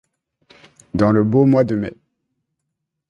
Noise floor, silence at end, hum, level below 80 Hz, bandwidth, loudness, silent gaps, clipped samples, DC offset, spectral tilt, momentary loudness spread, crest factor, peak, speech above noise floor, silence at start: -78 dBFS; 1.2 s; none; -48 dBFS; 7.6 kHz; -16 LUFS; none; under 0.1%; under 0.1%; -9.5 dB/octave; 13 LU; 16 dB; -2 dBFS; 63 dB; 0.95 s